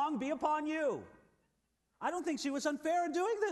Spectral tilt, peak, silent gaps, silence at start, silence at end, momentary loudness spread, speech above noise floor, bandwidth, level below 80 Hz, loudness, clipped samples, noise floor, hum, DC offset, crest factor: -4 dB/octave; -22 dBFS; none; 0 s; 0 s; 5 LU; 45 dB; 12 kHz; -76 dBFS; -36 LUFS; under 0.1%; -80 dBFS; none; under 0.1%; 14 dB